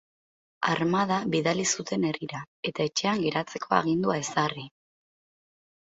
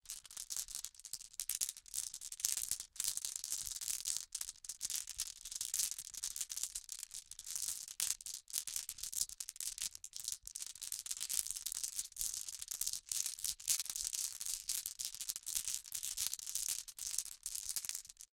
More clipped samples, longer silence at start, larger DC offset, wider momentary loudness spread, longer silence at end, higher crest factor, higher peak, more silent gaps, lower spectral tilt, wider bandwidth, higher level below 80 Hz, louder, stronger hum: neither; first, 0.6 s vs 0.05 s; neither; about the same, 9 LU vs 7 LU; first, 1.15 s vs 0.1 s; second, 22 dB vs 34 dB; first, -6 dBFS vs -10 dBFS; first, 2.48-2.63 s vs none; first, -4 dB/octave vs 3 dB/octave; second, 8.2 kHz vs 17 kHz; about the same, -66 dBFS vs -70 dBFS; first, -27 LUFS vs -40 LUFS; neither